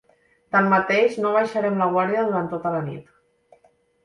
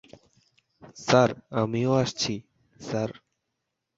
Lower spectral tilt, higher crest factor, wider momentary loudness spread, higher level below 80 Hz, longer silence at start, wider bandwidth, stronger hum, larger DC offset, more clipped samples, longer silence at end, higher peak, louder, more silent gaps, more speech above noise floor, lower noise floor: first, -7 dB/octave vs -5 dB/octave; second, 18 dB vs 24 dB; second, 9 LU vs 15 LU; about the same, -66 dBFS vs -62 dBFS; second, 0.55 s vs 0.85 s; first, 11.5 kHz vs 8 kHz; neither; neither; neither; first, 1.05 s vs 0.85 s; about the same, -4 dBFS vs -4 dBFS; first, -21 LUFS vs -26 LUFS; neither; second, 40 dB vs 57 dB; second, -60 dBFS vs -82 dBFS